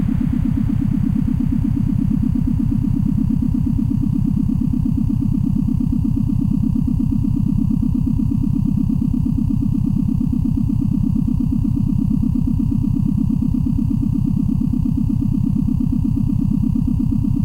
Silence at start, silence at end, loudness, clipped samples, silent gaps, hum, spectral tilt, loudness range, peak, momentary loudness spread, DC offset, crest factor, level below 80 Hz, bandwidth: 0 s; 0 s; -19 LUFS; under 0.1%; none; none; -10.5 dB/octave; 0 LU; -6 dBFS; 1 LU; under 0.1%; 10 dB; -26 dBFS; 15.5 kHz